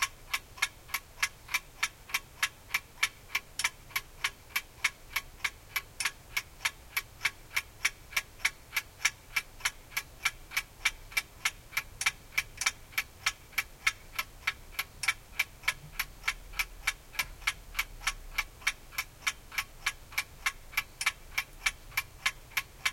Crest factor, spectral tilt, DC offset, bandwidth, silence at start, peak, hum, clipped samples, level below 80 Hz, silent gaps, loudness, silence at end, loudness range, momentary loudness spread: 26 dB; 0.5 dB/octave; under 0.1%; 17 kHz; 0 s; -10 dBFS; none; under 0.1%; -52 dBFS; none; -34 LUFS; 0 s; 2 LU; 6 LU